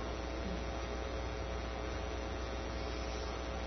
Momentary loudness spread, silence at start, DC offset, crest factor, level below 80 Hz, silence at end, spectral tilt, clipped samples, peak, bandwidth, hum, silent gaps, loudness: 1 LU; 0 s; under 0.1%; 12 dB; -44 dBFS; 0 s; -4.5 dB/octave; under 0.1%; -28 dBFS; 6.2 kHz; none; none; -41 LUFS